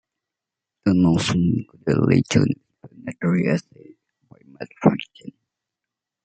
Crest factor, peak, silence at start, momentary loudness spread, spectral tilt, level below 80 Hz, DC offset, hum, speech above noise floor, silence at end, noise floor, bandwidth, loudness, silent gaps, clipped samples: 20 dB; -2 dBFS; 0.85 s; 19 LU; -6.5 dB/octave; -54 dBFS; under 0.1%; none; 66 dB; 0.95 s; -86 dBFS; 9 kHz; -21 LUFS; none; under 0.1%